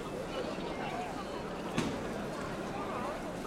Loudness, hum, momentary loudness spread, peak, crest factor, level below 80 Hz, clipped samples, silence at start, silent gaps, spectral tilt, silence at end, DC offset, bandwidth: -38 LUFS; none; 4 LU; -18 dBFS; 20 dB; -54 dBFS; under 0.1%; 0 s; none; -5 dB/octave; 0 s; under 0.1%; 16 kHz